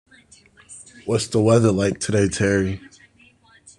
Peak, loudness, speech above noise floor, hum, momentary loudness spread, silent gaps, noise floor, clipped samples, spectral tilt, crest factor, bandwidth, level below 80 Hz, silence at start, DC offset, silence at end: -4 dBFS; -20 LUFS; 35 dB; none; 18 LU; none; -54 dBFS; under 0.1%; -5.5 dB/octave; 18 dB; 11 kHz; -52 dBFS; 0.7 s; under 0.1%; 1 s